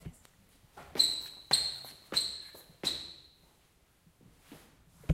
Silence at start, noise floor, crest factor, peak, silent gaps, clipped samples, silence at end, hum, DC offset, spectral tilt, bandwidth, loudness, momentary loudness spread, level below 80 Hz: 0.05 s; -67 dBFS; 26 dB; -10 dBFS; none; under 0.1%; 0 s; none; under 0.1%; -2 dB/octave; 16 kHz; -32 LUFS; 22 LU; -64 dBFS